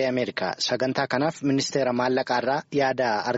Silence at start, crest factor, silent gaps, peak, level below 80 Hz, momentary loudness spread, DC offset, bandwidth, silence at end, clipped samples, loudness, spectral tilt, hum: 0 s; 16 dB; none; -8 dBFS; -64 dBFS; 3 LU; under 0.1%; 8 kHz; 0 s; under 0.1%; -25 LUFS; -3.5 dB/octave; none